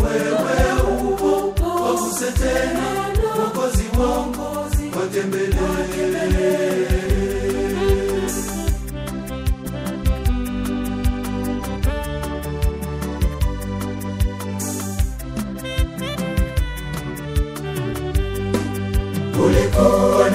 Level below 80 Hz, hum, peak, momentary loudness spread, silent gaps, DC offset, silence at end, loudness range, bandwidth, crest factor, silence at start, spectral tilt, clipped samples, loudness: -26 dBFS; none; -2 dBFS; 8 LU; none; under 0.1%; 0 s; 5 LU; 16 kHz; 18 dB; 0 s; -5.5 dB/octave; under 0.1%; -21 LUFS